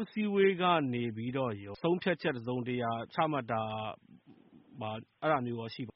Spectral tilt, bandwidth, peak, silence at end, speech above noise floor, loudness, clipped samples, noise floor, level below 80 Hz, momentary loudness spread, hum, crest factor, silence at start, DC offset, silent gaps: -4.5 dB/octave; 5.8 kHz; -14 dBFS; 0.05 s; 27 dB; -33 LUFS; under 0.1%; -59 dBFS; -72 dBFS; 13 LU; none; 20 dB; 0 s; under 0.1%; none